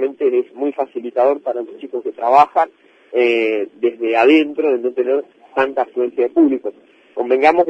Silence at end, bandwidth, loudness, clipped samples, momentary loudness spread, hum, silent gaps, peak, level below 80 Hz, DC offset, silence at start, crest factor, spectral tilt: 0 s; 7.8 kHz; -17 LUFS; under 0.1%; 12 LU; none; none; 0 dBFS; -66 dBFS; under 0.1%; 0 s; 16 dB; -5.5 dB/octave